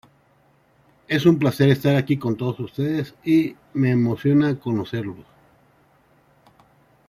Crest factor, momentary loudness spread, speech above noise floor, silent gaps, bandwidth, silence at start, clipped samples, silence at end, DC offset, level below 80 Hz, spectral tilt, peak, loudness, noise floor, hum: 18 dB; 9 LU; 39 dB; none; 15.5 kHz; 1.1 s; under 0.1%; 1.85 s; under 0.1%; -60 dBFS; -8 dB/octave; -4 dBFS; -21 LUFS; -59 dBFS; none